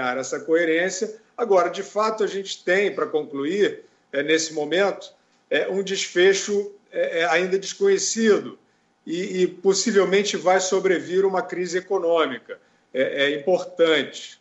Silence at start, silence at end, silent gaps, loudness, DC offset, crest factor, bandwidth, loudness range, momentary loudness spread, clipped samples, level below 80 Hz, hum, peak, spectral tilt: 0 s; 0.05 s; none; -22 LUFS; under 0.1%; 16 dB; 8.2 kHz; 2 LU; 10 LU; under 0.1%; -74 dBFS; none; -8 dBFS; -3 dB/octave